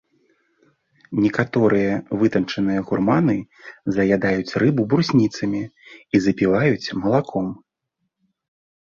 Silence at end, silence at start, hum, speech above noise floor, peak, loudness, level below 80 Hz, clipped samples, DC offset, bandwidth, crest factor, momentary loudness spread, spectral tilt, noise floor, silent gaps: 1.3 s; 1.1 s; none; 57 dB; -2 dBFS; -20 LUFS; -54 dBFS; under 0.1%; under 0.1%; 7.4 kHz; 18 dB; 9 LU; -7 dB/octave; -77 dBFS; none